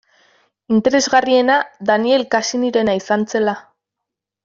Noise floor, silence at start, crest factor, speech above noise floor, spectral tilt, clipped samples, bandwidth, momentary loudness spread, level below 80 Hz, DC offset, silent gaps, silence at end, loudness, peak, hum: -82 dBFS; 0.7 s; 16 dB; 66 dB; -3.5 dB/octave; under 0.1%; 7.6 kHz; 5 LU; -60 dBFS; under 0.1%; none; 0.85 s; -16 LUFS; -2 dBFS; none